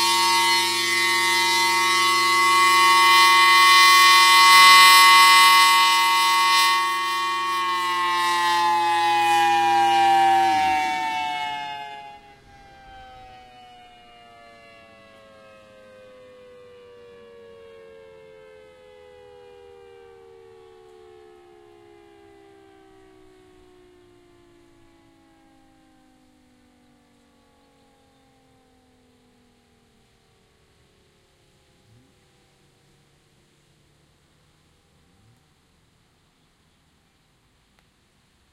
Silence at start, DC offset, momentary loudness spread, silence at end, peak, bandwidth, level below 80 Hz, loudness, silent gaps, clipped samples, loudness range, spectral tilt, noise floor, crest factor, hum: 0 s; under 0.1%; 13 LU; 26.4 s; 0 dBFS; 16 kHz; -66 dBFS; -15 LUFS; none; under 0.1%; 15 LU; 0.5 dB/octave; -62 dBFS; 22 dB; none